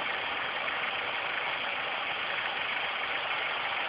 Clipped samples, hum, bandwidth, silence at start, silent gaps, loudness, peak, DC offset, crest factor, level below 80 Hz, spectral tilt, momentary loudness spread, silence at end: under 0.1%; none; 5.6 kHz; 0 s; none; -31 LUFS; -16 dBFS; under 0.1%; 16 dB; -70 dBFS; 2 dB/octave; 1 LU; 0 s